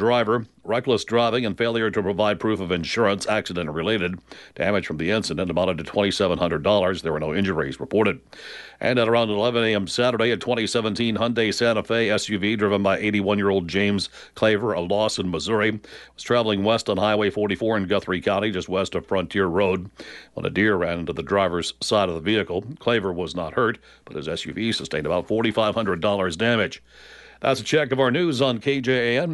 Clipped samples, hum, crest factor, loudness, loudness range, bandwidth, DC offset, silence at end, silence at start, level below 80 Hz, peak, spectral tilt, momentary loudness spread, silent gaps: under 0.1%; none; 16 dB; -22 LUFS; 2 LU; 11.5 kHz; under 0.1%; 0 s; 0 s; -52 dBFS; -6 dBFS; -5 dB/octave; 7 LU; none